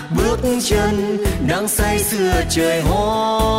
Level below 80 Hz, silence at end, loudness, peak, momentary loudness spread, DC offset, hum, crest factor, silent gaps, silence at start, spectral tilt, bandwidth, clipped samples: -26 dBFS; 0 s; -17 LUFS; -6 dBFS; 2 LU; under 0.1%; none; 10 dB; none; 0 s; -4.5 dB/octave; 16.5 kHz; under 0.1%